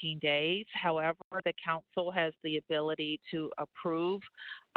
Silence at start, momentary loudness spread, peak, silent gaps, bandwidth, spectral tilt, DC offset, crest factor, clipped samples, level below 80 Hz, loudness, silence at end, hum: 0 s; 8 LU; -16 dBFS; 1.24-1.31 s; 4.8 kHz; -7.5 dB/octave; under 0.1%; 18 dB; under 0.1%; -76 dBFS; -34 LUFS; 0.15 s; none